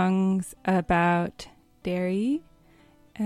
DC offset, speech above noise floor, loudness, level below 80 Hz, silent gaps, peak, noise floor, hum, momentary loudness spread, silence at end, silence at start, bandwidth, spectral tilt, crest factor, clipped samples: under 0.1%; 32 dB; -26 LUFS; -52 dBFS; none; -12 dBFS; -57 dBFS; none; 14 LU; 0 s; 0 s; 13 kHz; -7 dB/octave; 16 dB; under 0.1%